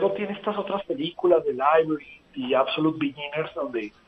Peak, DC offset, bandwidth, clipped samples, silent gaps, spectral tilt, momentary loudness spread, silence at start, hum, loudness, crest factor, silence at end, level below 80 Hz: -6 dBFS; under 0.1%; 6 kHz; under 0.1%; none; -8 dB/octave; 10 LU; 0 s; none; -25 LUFS; 18 dB; 0.2 s; -64 dBFS